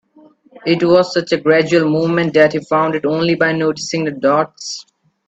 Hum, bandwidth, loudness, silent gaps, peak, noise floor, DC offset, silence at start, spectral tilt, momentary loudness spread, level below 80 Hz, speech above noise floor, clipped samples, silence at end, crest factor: none; 8.2 kHz; -15 LUFS; none; 0 dBFS; -48 dBFS; under 0.1%; 0.55 s; -5.5 dB/octave; 9 LU; -58 dBFS; 34 dB; under 0.1%; 0.45 s; 16 dB